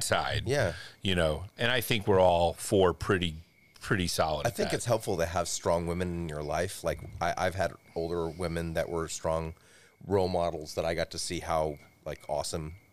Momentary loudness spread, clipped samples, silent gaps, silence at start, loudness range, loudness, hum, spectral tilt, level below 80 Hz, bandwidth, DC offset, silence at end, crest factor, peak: 9 LU; under 0.1%; none; 0 s; 5 LU; -30 LUFS; none; -4.5 dB/octave; -52 dBFS; 15.5 kHz; 0.3%; 0 s; 20 dB; -10 dBFS